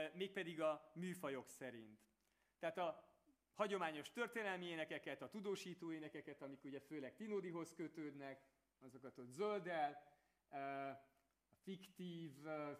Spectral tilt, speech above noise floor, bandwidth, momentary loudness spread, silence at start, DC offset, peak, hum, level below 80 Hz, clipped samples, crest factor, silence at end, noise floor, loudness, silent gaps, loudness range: -5 dB/octave; 34 dB; 15.5 kHz; 15 LU; 0 s; under 0.1%; -28 dBFS; none; under -90 dBFS; under 0.1%; 22 dB; 0 s; -83 dBFS; -49 LUFS; none; 4 LU